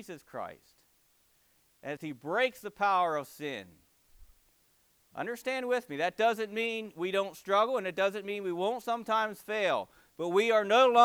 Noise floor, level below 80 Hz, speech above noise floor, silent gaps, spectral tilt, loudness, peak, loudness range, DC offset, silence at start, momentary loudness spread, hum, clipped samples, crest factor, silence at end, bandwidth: -69 dBFS; -72 dBFS; 39 dB; none; -4 dB/octave; -31 LUFS; -10 dBFS; 4 LU; under 0.1%; 0 s; 15 LU; none; under 0.1%; 22 dB; 0 s; over 20 kHz